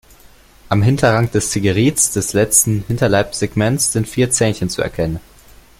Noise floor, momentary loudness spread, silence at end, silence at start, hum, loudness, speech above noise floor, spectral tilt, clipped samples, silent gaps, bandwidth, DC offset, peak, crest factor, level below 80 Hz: -45 dBFS; 8 LU; 0.6 s; 0.7 s; none; -15 LUFS; 30 dB; -4.5 dB/octave; under 0.1%; none; 16.5 kHz; under 0.1%; 0 dBFS; 16 dB; -40 dBFS